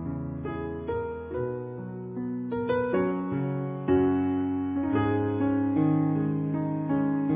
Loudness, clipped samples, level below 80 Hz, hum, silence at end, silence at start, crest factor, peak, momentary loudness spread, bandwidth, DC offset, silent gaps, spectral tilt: -28 LUFS; under 0.1%; -50 dBFS; none; 0 s; 0 s; 14 dB; -12 dBFS; 9 LU; 3.8 kHz; under 0.1%; none; -8.5 dB/octave